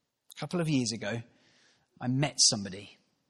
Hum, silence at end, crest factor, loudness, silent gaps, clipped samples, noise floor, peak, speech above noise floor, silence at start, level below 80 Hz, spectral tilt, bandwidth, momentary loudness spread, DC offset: none; 0.4 s; 22 dB; -29 LUFS; none; under 0.1%; -66 dBFS; -10 dBFS; 36 dB; 0.35 s; -70 dBFS; -3 dB/octave; 13 kHz; 18 LU; under 0.1%